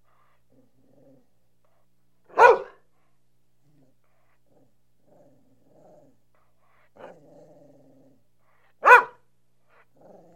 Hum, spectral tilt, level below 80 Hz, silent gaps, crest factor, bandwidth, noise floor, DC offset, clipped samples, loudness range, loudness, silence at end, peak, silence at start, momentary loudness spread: 60 Hz at -75 dBFS; -2.5 dB/octave; -68 dBFS; none; 28 dB; 13.5 kHz; -72 dBFS; 0.1%; under 0.1%; 2 LU; -17 LUFS; 1.3 s; 0 dBFS; 2.35 s; 21 LU